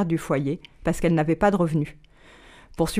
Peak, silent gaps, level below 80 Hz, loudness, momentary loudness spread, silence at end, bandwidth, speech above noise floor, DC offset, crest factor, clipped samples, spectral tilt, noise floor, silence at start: -8 dBFS; none; -42 dBFS; -24 LUFS; 9 LU; 0 s; 15.5 kHz; 27 dB; under 0.1%; 16 dB; under 0.1%; -7 dB/octave; -50 dBFS; 0 s